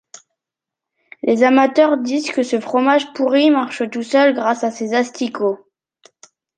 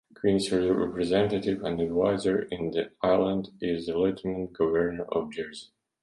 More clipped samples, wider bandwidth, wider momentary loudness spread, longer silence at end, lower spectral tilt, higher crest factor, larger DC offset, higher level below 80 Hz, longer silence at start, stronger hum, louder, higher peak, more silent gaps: neither; second, 9.4 kHz vs 11.5 kHz; about the same, 9 LU vs 7 LU; first, 1 s vs 0.35 s; second, -4 dB/octave vs -6 dB/octave; about the same, 16 dB vs 16 dB; neither; second, -70 dBFS vs -54 dBFS; first, 1.25 s vs 0.25 s; neither; first, -16 LUFS vs -28 LUFS; first, -2 dBFS vs -10 dBFS; neither